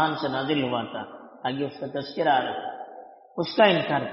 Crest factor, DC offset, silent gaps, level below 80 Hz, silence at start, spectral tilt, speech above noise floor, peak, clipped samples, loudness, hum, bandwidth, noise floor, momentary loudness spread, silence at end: 20 dB; under 0.1%; none; -68 dBFS; 0 s; -3 dB/octave; 21 dB; -6 dBFS; under 0.1%; -25 LUFS; none; 6 kHz; -46 dBFS; 20 LU; 0 s